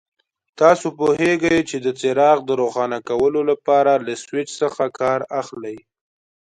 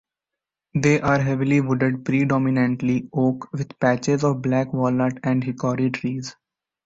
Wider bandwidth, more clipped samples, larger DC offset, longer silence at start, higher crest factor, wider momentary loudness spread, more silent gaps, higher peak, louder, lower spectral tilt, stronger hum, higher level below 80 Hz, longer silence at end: first, 11 kHz vs 8 kHz; neither; neither; second, 0.6 s vs 0.75 s; about the same, 20 dB vs 16 dB; first, 11 LU vs 8 LU; neither; first, 0 dBFS vs -6 dBFS; first, -19 LUFS vs -22 LUFS; second, -5 dB/octave vs -7 dB/octave; neither; about the same, -58 dBFS vs -54 dBFS; first, 0.75 s vs 0.55 s